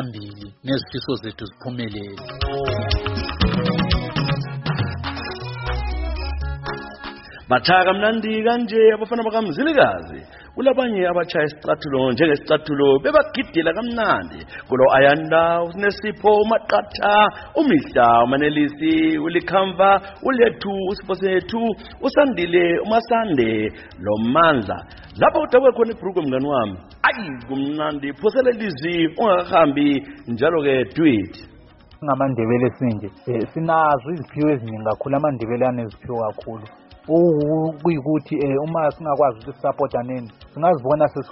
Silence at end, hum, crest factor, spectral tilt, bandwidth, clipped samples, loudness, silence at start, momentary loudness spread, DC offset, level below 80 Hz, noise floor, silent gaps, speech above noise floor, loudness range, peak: 0 s; none; 18 dB; -4.5 dB/octave; 6 kHz; under 0.1%; -19 LUFS; 0 s; 13 LU; under 0.1%; -38 dBFS; -46 dBFS; none; 28 dB; 6 LU; -2 dBFS